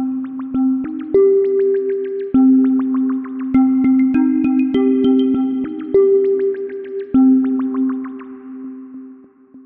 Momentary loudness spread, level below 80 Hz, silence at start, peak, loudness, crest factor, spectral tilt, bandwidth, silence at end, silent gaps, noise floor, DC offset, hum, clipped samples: 17 LU; -52 dBFS; 0 s; -4 dBFS; -16 LUFS; 12 dB; -10.5 dB/octave; 3.4 kHz; 0.05 s; none; -43 dBFS; under 0.1%; none; under 0.1%